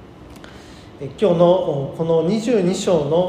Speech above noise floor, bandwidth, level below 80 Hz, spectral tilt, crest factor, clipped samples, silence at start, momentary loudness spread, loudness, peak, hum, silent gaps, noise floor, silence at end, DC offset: 23 dB; 11 kHz; -50 dBFS; -6.5 dB/octave; 18 dB; under 0.1%; 0 s; 22 LU; -18 LUFS; -2 dBFS; none; none; -40 dBFS; 0 s; under 0.1%